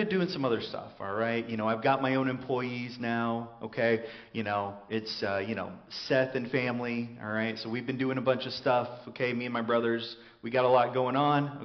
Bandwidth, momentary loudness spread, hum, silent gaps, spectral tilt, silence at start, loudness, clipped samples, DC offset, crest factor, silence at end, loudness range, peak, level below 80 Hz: 6.4 kHz; 10 LU; none; none; -4 dB/octave; 0 s; -30 LUFS; under 0.1%; under 0.1%; 18 dB; 0 s; 3 LU; -12 dBFS; -70 dBFS